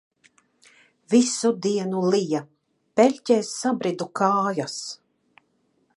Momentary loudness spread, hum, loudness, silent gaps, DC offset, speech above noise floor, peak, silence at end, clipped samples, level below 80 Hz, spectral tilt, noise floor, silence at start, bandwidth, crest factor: 10 LU; none; -23 LUFS; none; under 0.1%; 46 dB; -4 dBFS; 1 s; under 0.1%; -76 dBFS; -4.5 dB/octave; -68 dBFS; 1.1 s; 11.5 kHz; 20 dB